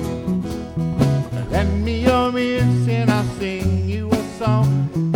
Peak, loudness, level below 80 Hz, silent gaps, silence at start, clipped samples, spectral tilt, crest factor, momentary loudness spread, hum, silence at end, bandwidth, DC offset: -4 dBFS; -20 LUFS; -34 dBFS; none; 0 s; under 0.1%; -7.5 dB/octave; 16 dB; 6 LU; none; 0 s; 16.5 kHz; under 0.1%